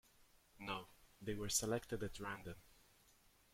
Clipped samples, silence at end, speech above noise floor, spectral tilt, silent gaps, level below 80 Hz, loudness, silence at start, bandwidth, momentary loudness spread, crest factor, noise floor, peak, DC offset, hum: under 0.1%; 0.8 s; 28 dB; -3 dB/octave; none; -64 dBFS; -44 LUFS; 0.55 s; 16.5 kHz; 17 LU; 24 dB; -72 dBFS; -24 dBFS; under 0.1%; none